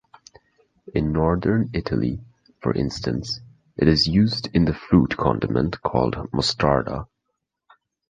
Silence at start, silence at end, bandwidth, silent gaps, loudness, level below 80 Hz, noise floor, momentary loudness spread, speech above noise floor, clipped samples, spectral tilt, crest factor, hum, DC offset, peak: 0.85 s; 1.05 s; 9.4 kHz; none; -22 LUFS; -38 dBFS; -79 dBFS; 11 LU; 58 dB; under 0.1%; -6.5 dB/octave; 20 dB; none; under 0.1%; -2 dBFS